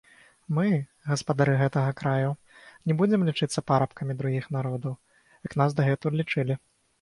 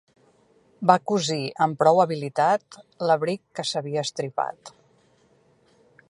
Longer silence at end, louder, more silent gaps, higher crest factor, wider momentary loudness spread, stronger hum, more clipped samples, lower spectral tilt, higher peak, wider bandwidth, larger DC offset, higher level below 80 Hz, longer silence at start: second, 0.45 s vs 1.4 s; second, -27 LUFS vs -24 LUFS; neither; second, 18 dB vs 24 dB; about the same, 11 LU vs 10 LU; neither; neither; first, -7 dB/octave vs -5 dB/octave; second, -8 dBFS vs -2 dBFS; about the same, 11.5 kHz vs 11.5 kHz; neither; first, -62 dBFS vs -74 dBFS; second, 0.5 s vs 0.8 s